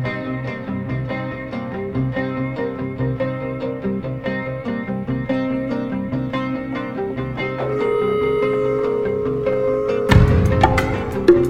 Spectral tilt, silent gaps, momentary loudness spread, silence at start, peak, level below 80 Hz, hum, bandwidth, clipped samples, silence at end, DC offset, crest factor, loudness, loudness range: -8 dB/octave; none; 10 LU; 0 s; 0 dBFS; -32 dBFS; none; 14 kHz; under 0.1%; 0 s; under 0.1%; 20 dB; -21 LUFS; 7 LU